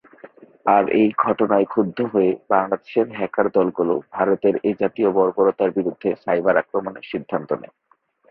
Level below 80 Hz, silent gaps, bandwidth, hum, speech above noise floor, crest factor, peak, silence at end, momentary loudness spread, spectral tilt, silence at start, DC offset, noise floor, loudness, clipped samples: -62 dBFS; none; 4.9 kHz; none; 26 dB; 18 dB; -2 dBFS; 0.65 s; 9 LU; -10.5 dB/octave; 0.25 s; under 0.1%; -46 dBFS; -20 LUFS; under 0.1%